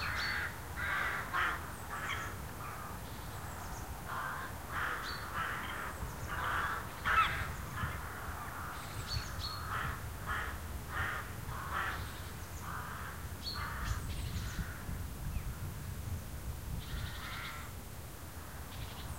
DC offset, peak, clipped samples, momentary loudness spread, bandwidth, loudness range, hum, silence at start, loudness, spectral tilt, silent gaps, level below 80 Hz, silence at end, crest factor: 0.2%; -18 dBFS; under 0.1%; 10 LU; 16 kHz; 6 LU; none; 0 s; -39 LUFS; -3.5 dB/octave; none; -48 dBFS; 0 s; 22 dB